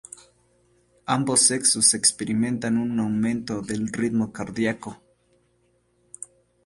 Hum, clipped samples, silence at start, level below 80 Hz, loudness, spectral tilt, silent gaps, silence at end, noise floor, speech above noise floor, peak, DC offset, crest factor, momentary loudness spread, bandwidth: none; under 0.1%; 1.05 s; -60 dBFS; -22 LUFS; -3 dB/octave; none; 0.4 s; -66 dBFS; 43 dB; -2 dBFS; under 0.1%; 24 dB; 23 LU; 11.5 kHz